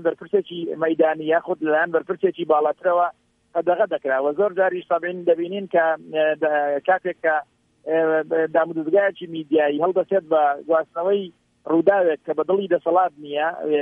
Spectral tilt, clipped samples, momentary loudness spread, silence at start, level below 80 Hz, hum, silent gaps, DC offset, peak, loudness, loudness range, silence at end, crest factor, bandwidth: -8 dB/octave; under 0.1%; 5 LU; 0 s; -74 dBFS; none; none; under 0.1%; -4 dBFS; -21 LUFS; 1 LU; 0 s; 16 dB; 3.7 kHz